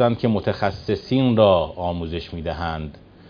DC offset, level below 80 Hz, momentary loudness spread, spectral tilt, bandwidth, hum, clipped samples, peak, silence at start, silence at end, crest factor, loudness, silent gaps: under 0.1%; -42 dBFS; 13 LU; -8.5 dB/octave; 5.2 kHz; none; under 0.1%; -2 dBFS; 0 s; 0.3 s; 20 dB; -21 LUFS; none